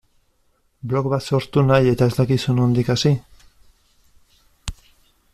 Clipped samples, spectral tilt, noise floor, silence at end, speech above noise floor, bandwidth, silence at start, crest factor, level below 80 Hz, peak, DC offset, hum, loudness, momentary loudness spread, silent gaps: under 0.1%; -7 dB/octave; -63 dBFS; 0.6 s; 46 dB; 13.5 kHz; 0.85 s; 16 dB; -44 dBFS; -4 dBFS; under 0.1%; none; -19 LUFS; 20 LU; none